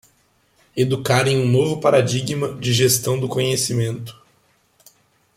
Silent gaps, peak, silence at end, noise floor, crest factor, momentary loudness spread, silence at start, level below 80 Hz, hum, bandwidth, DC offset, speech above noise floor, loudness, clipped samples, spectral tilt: none; -4 dBFS; 1.25 s; -61 dBFS; 18 dB; 9 LU; 0.75 s; -56 dBFS; none; 16 kHz; under 0.1%; 42 dB; -19 LUFS; under 0.1%; -4.5 dB/octave